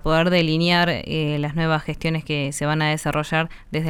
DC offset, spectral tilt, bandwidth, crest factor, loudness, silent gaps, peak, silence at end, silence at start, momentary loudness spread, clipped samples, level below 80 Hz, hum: under 0.1%; -5.5 dB/octave; 14 kHz; 14 dB; -21 LUFS; none; -6 dBFS; 0 s; 0.05 s; 7 LU; under 0.1%; -40 dBFS; none